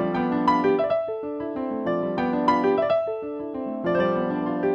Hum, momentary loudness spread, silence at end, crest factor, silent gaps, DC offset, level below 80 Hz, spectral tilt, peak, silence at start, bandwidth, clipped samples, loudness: none; 9 LU; 0 s; 16 dB; none; under 0.1%; -58 dBFS; -8 dB/octave; -8 dBFS; 0 s; 7.6 kHz; under 0.1%; -24 LUFS